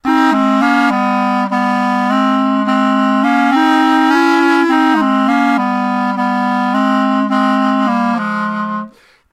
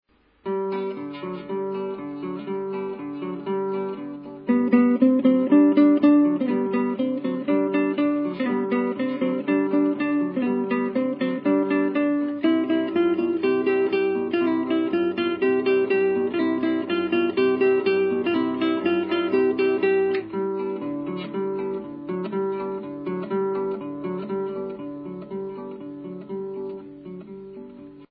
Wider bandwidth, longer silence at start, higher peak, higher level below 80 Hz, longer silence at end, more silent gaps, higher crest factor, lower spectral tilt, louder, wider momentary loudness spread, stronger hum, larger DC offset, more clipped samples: first, 13 kHz vs 5.2 kHz; second, 0.05 s vs 0.45 s; about the same, -4 dBFS vs -6 dBFS; first, -60 dBFS vs -68 dBFS; first, 0.45 s vs 0.05 s; neither; second, 10 dB vs 18 dB; second, -5.5 dB/octave vs -10 dB/octave; first, -13 LUFS vs -23 LUFS; second, 5 LU vs 14 LU; neither; neither; neither